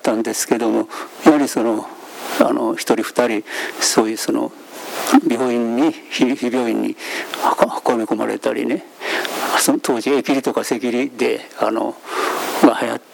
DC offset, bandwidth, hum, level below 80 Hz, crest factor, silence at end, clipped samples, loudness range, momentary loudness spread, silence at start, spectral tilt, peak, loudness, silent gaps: under 0.1%; over 20 kHz; none; -68 dBFS; 18 dB; 0.15 s; under 0.1%; 1 LU; 9 LU; 0.05 s; -3 dB/octave; 0 dBFS; -18 LUFS; none